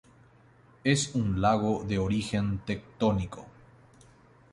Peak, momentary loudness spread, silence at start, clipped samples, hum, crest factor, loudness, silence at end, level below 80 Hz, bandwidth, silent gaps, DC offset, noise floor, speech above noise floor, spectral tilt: -10 dBFS; 9 LU; 0.85 s; under 0.1%; none; 20 dB; -29 LUFS; 1.05 s; -48 dBFS; 11.5 kHz; none; under 0.1%; -58 dBFS; 30 dB; -5.5 dB/octave